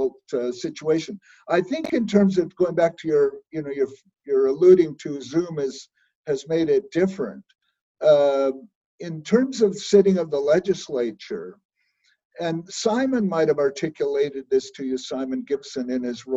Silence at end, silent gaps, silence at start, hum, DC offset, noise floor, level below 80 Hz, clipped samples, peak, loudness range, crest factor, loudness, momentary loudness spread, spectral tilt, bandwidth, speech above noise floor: 0 s; 6.15-6.24 s, 7.81-7.95 s, 8.75-8.98 s, 11.65-11.69 s, 12.25-12.30 s; 0 s; none; under 0.1%; -67 dBFS; -64 dBFS; under 0.1%; -4 dBFS; 4 LU; 20 dB; -22 LUFS; 14 LU; -6 dB/octave; 8 kHz; 45 dB